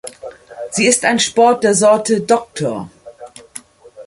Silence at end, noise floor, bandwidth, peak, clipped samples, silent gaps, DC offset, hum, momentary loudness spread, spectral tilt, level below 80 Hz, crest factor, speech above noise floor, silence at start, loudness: 0 s; -38 dBFS; 11.5 kHz; 0 dBFS; under 0.1%; none; under 0.1%; none; 22 LU; -3 dB/octave; -56 dBFS; 16 dB; 24 dB; 0.05 s; -14 LUFS